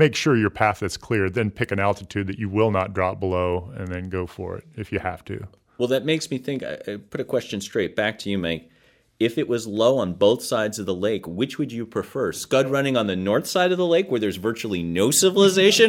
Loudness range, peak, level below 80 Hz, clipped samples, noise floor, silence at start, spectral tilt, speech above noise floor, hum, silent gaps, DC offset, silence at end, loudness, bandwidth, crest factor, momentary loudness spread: 6 LU; -4 dBFS; -54 dBFS; under 0.1%; -46 dBFS; 0 s; -4.5 dB/octave; 24 dB; none; none; under 0.1%; 0 s; -23 LUFS; 16.5 kHz; 18 dB; 11 LU